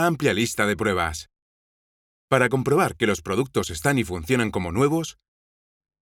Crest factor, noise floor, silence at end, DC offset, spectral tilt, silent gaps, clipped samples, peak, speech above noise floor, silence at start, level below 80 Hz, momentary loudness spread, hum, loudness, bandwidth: 22 dB; under -90 dBFS; 0.9 s; under 0.1%; -5 dB/octave; 1.42-2.28 s; under 0.1%; -2 dBFS; over 67 dB; 0 s; -48 dBFS; 5 LU; none; -23 LUFS; 18 kHz